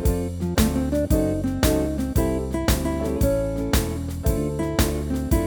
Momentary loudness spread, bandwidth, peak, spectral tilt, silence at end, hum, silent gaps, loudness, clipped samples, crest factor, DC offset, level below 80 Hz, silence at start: 4 LU; over 20 kHz; -4 dBFS; -6 dB/octave; 0 s; none; none; -23 LUFS; under 0.1%; 18 dB; under 0.1%; -28 dBFS; 0 s